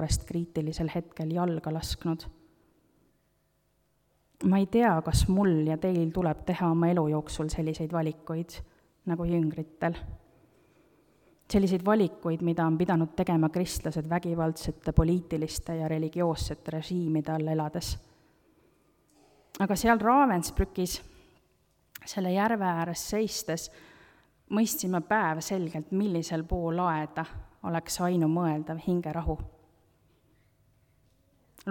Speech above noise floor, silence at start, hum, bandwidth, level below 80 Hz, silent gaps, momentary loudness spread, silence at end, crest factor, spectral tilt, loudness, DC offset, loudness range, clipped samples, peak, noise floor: 43 dB; 0 s; none; 18.5 kHz; -44 dBFS; none; 11 LU; 0 s; 22 dB; -6 dB/octave; -29 LUFS; under 0.1%; 6 LU; under 0.1%; -8 dBFS; -71 dBFS